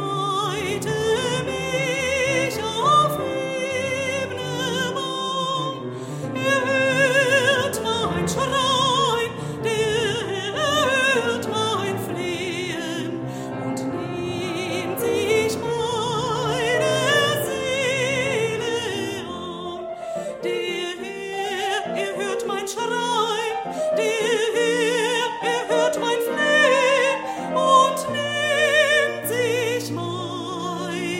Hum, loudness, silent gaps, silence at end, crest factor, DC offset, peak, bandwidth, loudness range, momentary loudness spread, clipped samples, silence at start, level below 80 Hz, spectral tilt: none; -22 LUFS; none; 0 s; 18 dB; under 0.1%; -6 dBFS; 16 kHz; 7 LU; 11 LU; under 0.1%; 0 s; -54 dBFS; -3.5 dB/octave